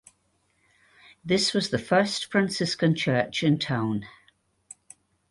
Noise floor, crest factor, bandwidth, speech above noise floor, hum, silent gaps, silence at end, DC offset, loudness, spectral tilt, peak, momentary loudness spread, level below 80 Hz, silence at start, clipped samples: -70 dBFS; 18 dB; 11.5 kHz; 45 dB; none; none; 1.2 s; under 0.1%; -25 LUFS; -5 dB/octave; -8 dBFS; 10 LU; -62 dBFS; 1.25 s; under 0.1%